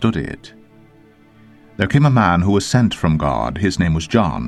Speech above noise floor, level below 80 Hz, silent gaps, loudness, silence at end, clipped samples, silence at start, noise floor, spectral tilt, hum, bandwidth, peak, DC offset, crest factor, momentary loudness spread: 32 dB; -36 dBFS; none; -17 LUFS; 0 s; under 0.1%; 0 s; -48 dBFS; -6.5 dB/octave; none; 12.5 kHz; 0 dBFS; under 0.1%; 18 dB; 12 LU